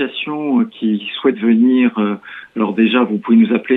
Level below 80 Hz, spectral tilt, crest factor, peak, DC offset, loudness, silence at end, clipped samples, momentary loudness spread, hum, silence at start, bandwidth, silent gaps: -64 dBFS; -9 dB/octave; 14 dB; 0 dBFS; under 0.1%; -15 LUFS; 0 s; under 0.1%; 9 LU; none; 0 s; 4 kHz; none